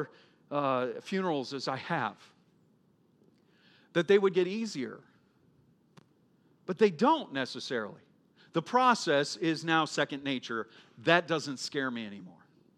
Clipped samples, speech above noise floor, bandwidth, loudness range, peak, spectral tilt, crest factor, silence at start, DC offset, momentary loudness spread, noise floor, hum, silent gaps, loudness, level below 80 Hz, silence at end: under 0.1%; 37 dB; 12 kHz; 6 LU; -8 dBFS; -4.5 dB/octave; 24 dB; 0 s; under 0.1%; 15 LU; -67 dBFS; none; none; -30 LUFS; -86 dBFS; 0.45 s